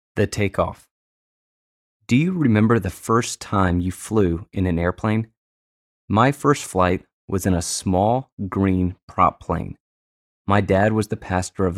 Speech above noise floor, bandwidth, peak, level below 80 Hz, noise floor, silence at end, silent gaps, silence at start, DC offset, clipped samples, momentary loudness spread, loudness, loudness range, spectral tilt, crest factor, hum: over 70 dB; 14.5 kHz; -4 dBFS; -44 dBFS; under -90 dBFS; 0 s; 0.91-2.00 s, 5.37-6.08 s, 7.13-7.28 s, 8.32-8.37 s, 9.03-9.08 s, 9.80-10.45 s; 0.15 s; under 0.1%; under 0.1%; 9 LU; -21 LUFS; 2 LU; -6 dB/octave; 18 dB; none